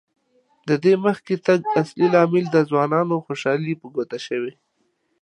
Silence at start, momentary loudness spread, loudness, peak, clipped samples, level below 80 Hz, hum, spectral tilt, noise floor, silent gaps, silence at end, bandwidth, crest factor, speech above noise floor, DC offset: 0.65 s; 10 LU; -20 LUFS; -2 dBFS; under 0.1%; -72 dBFS; none; -7 dB/octave; -69 dBFS; none; 0.7 s; 9.6 kHz; 18 dB; 49 dB; under 0.1%